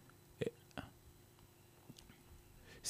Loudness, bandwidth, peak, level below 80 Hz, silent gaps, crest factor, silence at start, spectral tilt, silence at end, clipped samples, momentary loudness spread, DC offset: -52 LUFS; 15.5 kHz; -26 dBFS; -68 dBFS; none; 26 dB; 0 s; -4 dB/octave; 0 s; under 0.1%; 18 LU; under 0.1%